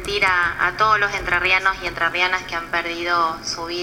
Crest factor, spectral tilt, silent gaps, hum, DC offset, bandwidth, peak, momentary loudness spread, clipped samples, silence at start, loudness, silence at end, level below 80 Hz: 18 dB; -2.5 dB/octave; none; none; under 0.1%; 17 kHz; -4 dBFS; 7 LU; under 0.1%; 0 s; -19 LUFS; 0 s; -42 dBFS